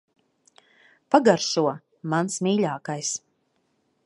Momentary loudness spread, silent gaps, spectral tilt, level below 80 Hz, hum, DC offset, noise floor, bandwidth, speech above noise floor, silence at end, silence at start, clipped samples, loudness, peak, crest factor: 10 LU; none; -4.5 dB/octave; -76 dBFS; none; under 0.1%; -71 dBFS; 11.5 kHz; 48 dB; 0.9 s; 1.1 s; under 0.1%; -24 LUFS; -2 dBFS; 24 dB